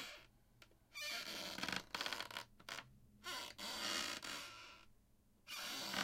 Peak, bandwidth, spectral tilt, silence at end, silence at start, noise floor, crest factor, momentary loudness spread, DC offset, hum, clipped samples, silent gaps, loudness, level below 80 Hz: -26 dBFS; 16.5 kHz; -1 dB/octave; 0 s; 0 s; -72 dBFS; 22 dB; 15 LU; under 0.1%; none; under 0.1%; none; -46 LUFS; -74 dBFS